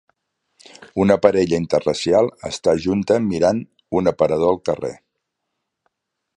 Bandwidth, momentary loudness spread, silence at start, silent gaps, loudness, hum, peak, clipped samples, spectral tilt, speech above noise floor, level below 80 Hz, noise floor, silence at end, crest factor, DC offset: 10.5 kHz; 9 LU; 0.8 s; none; -19 LUFS; none; 0 dBFS; under 0.1%; -6 dB/octave; 60 dB; -48 dBFS; -78 dBFS; 1.4 s; 20 dB; under 0.1%